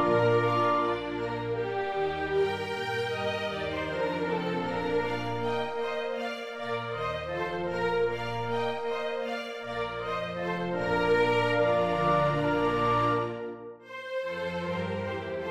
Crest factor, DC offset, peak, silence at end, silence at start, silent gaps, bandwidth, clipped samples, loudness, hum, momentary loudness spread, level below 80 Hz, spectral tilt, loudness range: 16 dB; under 0.1%; -14 dBFS; 0 s; 0 s; none; 14 kHz; under 0.1%; -29 LUFS; none; 9 LU; -56 dBFS; -6.5 dB/octave; 5 LU